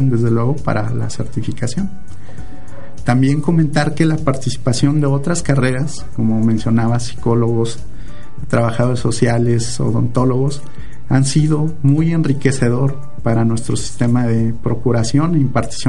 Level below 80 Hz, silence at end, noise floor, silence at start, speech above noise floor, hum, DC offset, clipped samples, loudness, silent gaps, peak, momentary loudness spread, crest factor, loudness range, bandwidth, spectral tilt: -38 dBFS; 0 s; -36 dBFS; 0 s; 20 dB; none; 10%; under 0.1%; -17 LUFS; none; 0 dBFS; 14 LU; 16 dB; 2 LU; 11.5 kHz; -6.5 dB/octave